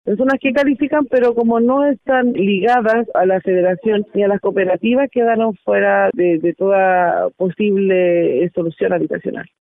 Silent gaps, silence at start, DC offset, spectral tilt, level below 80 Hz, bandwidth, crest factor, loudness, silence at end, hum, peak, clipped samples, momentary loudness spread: none; 0.05 s; under 0.1%; -8.5 dB/octave; -58 dBFS; 6.6 kHz; 10 dB; -15 LUFS; 0.2 s; none; -4 dBFS; under 0.1%; 4 LU